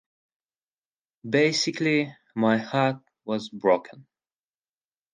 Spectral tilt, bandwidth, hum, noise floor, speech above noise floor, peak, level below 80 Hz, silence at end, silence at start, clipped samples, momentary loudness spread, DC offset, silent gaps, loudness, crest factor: -5 dB/octave; 10 kHz; none; under -90 dBFS; over 66 dB; -8 dBFS; -76 dBFS; 1.1 s; 1.25 s; under 0.1%; 10 LU; under 0.1%; none; -25 LUFS; 20 dB